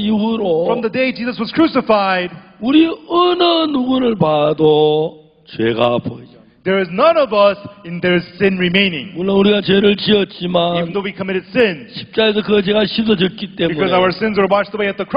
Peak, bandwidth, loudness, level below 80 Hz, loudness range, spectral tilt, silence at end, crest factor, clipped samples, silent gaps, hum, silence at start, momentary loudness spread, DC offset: -2 dBFS; 5.4 kHz; -15 LUFS; -50 dBFS; 2 LU; -9 dB/octave; 0 s; 14 dB; under 0.1%; none; none; 0 s; 9 LU; under 0.1%